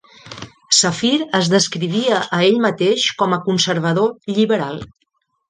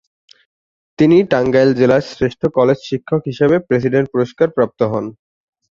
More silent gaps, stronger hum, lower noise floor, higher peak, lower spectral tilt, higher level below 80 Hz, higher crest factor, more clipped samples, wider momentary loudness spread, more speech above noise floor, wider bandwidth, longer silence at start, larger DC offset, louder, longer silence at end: neither; neither; second, -36 dBFS vs under -90 dBFS; about the same, 0 dBFS vs -2 dBFS; second, -3.5 dB/octave vs -8 dB/octave; second, -58 dBFS vs -50 dBFS; about the same, 16 dB vs 14 dB; neither; first, 14 LU vs 8 LU; second, 19 dB vs over 76 dB; first, 10 kHz vs 7.4 kHz; second, 0.25 s vs 1 s; neither; about the same, -16 LUFS vs -15 LUFS; about the same, 0.65 s vs 0.65 s